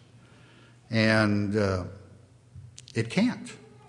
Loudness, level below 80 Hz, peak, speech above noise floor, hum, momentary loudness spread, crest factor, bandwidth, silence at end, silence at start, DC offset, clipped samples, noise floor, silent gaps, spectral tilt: -26 LUFS; -64 dBFS; -8 dBFS; 29 dB; none; 21 LU; 22 dB; 11.5 kHz; 0.3 s; 0.9 s; under 0.1%; under 0.1%; -54 dBFS; none; -6 dB/octave